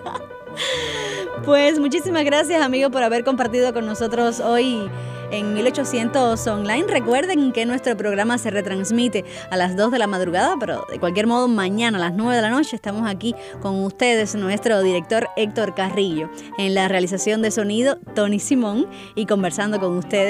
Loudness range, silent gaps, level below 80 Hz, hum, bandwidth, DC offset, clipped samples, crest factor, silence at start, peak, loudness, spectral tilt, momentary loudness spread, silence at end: 2 LU; none; -54 dBFS; none; 15.5 kHz; under 0.1%; under 0.1%; 16 dB; 0 s; -4 dBFS; -20 LUFS; -4.5 dB/octave; 8 LU; 0 s